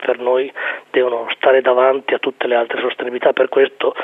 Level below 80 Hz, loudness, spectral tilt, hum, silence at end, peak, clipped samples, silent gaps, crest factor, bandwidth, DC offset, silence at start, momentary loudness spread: -72 dBFS; -16 LUFS; -5.5 dB/octave; none; 0 s; -2 dBFS; under 0.1%; none; 16 dB; 3.9 kHz; under 0.1%; 0 s; 7 LU